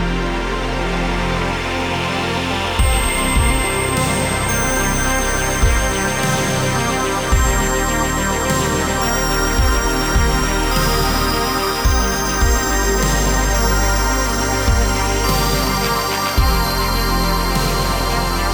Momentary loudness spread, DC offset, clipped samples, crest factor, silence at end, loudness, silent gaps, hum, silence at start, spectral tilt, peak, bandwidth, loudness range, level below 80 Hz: 3 LU; under 0.1%; under 0.1%; 14 dB; 0 s; -17 LUFS; none; none; 0 s; -3.5 dB/octave; -4 dBFS; over 20 kHz; 1 LU; -22 dBFS